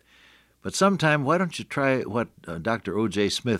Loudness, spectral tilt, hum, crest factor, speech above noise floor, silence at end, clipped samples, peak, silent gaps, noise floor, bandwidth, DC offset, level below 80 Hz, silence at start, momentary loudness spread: -25 LUFS; -5 dB/octave; none; 18 dB; 33 dB; 0 s; under 0.1%; -8 dBFS; none; -57 dBFS; 15 kHz; under 0.1%; -62 dBFS; 0.65 s; 10 LU